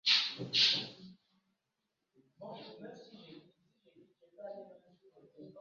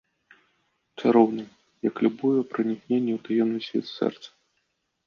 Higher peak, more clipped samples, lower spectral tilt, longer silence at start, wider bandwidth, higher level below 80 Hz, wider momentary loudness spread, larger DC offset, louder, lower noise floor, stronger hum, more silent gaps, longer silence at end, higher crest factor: second, -14 dBFS vs -6 dBFS; neither; second, 0.5 dB/octave vs -7.5 dB/octave; second, 0.05 s vs 1 s; about the same, 7.4 kHz vs 7 kHz; second, -84 dBFS vs -74 dBFS; first, 27 LU vs 10 LU; neither; second, -29 LUFS vs -25 LUFS; first, -86 dBFS vs -75 dBFS; neither; neither; second, 0 s vs 0.8 s; first, 26 dB vs 20 dB